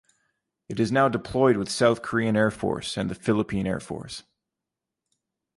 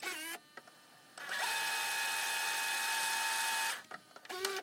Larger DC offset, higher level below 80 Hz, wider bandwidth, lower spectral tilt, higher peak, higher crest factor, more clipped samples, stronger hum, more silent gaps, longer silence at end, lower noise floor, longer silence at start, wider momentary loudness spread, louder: neither; first, -54 dBFS vs under -90 dBFS; second, 11.5 kHz vs 16.5 kHz; first, -5.5 dB/octave vs 1.5 dB/octave; first, -8 dBFS vs -20 dBFS; about the same, 18 dB vs 18 dB; neither; neither; neither; first, 1.4 s vs 0 s; first, -87 dBFS vs -60 dBFS; first, 0.7 s vs 0 s; second, 13 LU vs 18 LU; first, -25 LUFS vs -35 LUFS